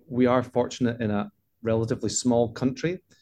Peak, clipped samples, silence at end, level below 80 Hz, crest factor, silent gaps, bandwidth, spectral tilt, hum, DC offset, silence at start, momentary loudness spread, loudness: -8 dBFS; under 0.1%; 0.25 s; -58 dBFS; 18 dB; none; 11.5 kHz; -5.5 dB/octave; none; under 0.1%; 0.1 s; 8 LU; -26 LUFS